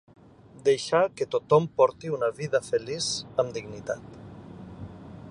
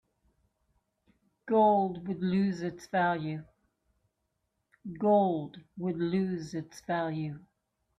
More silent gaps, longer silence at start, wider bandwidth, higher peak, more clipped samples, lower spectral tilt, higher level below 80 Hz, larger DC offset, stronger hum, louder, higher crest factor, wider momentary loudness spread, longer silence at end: neither; second, 0.6 s vs 1.45 s; about the same, 11 kHz vs 11 kHz; first, -8 dBFS vs -14 dBFS; neither; second, -4.5 dB/octave vs -7.5 dB/octave; first, -60 dBFS vs -70 dBFS; neither; neither; first, -26 LUFS vs -30 LUFS; about the same, 20 dB vs 18 dB; first, 21 LU vs 15 LU; second, 0 s vs 0.6 s